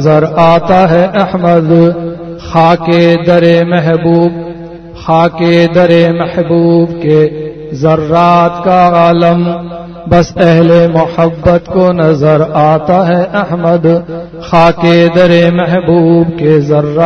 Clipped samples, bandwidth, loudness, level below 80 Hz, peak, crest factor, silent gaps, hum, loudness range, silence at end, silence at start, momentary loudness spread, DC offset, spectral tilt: 1%; 6.4 kHz; -8 LUFS; -36 dBFS; 0 dBFS; 8 dB; none; none; 1 LU; 0 s; 0 s; 8 LU; under 0.1%; -8 dB/octave